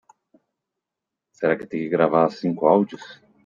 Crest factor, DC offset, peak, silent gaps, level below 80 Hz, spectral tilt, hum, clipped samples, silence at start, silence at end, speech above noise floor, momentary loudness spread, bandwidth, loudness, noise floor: 20 dB; under 0.1%; -4 dBFS; none; -70 dBFS; -8 dB/octave; none; under 0.1%; 1.4 s; 0.3 s; 65 dB; 8 LU; 7.4 kHz; -21 LUFS; -85 dBFS